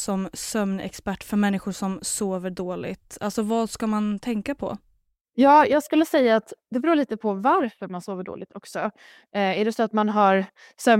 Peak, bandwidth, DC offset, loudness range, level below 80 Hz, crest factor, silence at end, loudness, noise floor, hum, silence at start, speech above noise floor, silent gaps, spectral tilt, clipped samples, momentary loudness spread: -2 dBFS; 16 kHz; under 0.1%; 6 LU; -58 dBFS; 20 dB; 0 s; -23 LUFS; -66 dBFS; none; 0 s; 43 dB; none; -5 dB/octave; under 0.1%; 14 LU